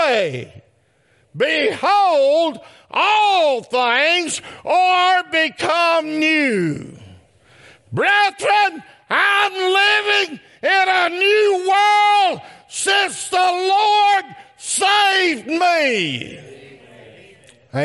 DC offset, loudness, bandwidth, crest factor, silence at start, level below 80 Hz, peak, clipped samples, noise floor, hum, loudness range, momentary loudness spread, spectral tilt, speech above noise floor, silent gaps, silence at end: under 0.1%; -16 LUFS; 11.5 kHz; 16 dB; 0 s; -68 dBFS; -2 dBFS; under 0.1%; -59 dBFS; none; 3 LU; 10 LU; -2.5 dB/octave; 42 dB; none; 0 s